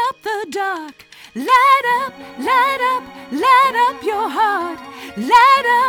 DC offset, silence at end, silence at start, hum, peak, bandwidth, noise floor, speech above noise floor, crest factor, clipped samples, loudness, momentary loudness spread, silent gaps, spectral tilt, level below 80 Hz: under 0.1%; 0 s; 0 s; none; -2 dBFS; 20 kHz; -39 dBFS; 24 dB; 14 dB; under 0.1%; -15 LUFS; 16 LU; none; -2.5 dB/octave; -58 dBFS